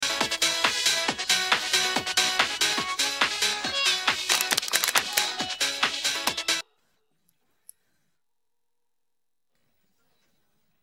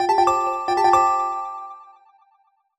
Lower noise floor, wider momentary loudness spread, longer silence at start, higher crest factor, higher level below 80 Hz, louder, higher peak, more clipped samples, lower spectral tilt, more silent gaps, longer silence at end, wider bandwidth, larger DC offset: first, -87 dBFS vs -63 dBFS; second, 4 LU vs 17 LU; about the same, 0 s vs 0 s; first, 26 dB vs 18 dB; second, -64 dBFS vs -56 dBFS; second, -23 LUFS vs -19 LUFS; about the same, -2 dBFS vs -4 dBFS; neither; second, 0.5 dB/octave vs -3.5 dB/octave; neither; first, 4.2 s vs 0.95 s; first, over 20 kHz vs 13 kHz; neither